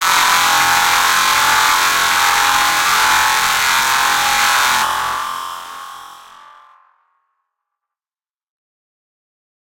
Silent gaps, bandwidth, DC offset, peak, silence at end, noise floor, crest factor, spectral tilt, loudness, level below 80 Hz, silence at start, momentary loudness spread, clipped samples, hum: none; 17.5 kHz; under 0.1%; 0 dBFS; 3.4 s; under -90 dBFS; 16 dB; 1 dB/octave; -12 LUFS; -50 dBFS; 0 s; 12 LU; under 0.1%; none